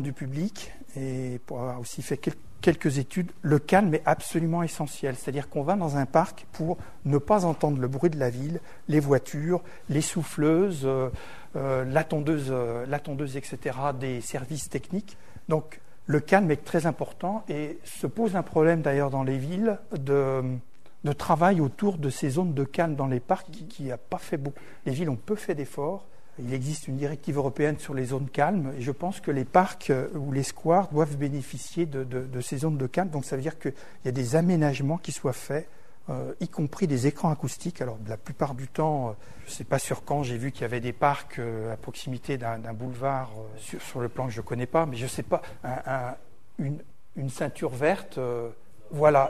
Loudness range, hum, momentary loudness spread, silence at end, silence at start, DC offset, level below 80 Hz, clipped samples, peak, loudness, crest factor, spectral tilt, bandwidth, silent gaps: 5 LU; none; 12 LU; 0 s; 0 s; 1%; -56 dBFS; under 0.1%; -4 dBFS; -28 LUFS; 24 dB; -6.5 dB/octave; 13.5 kHz; none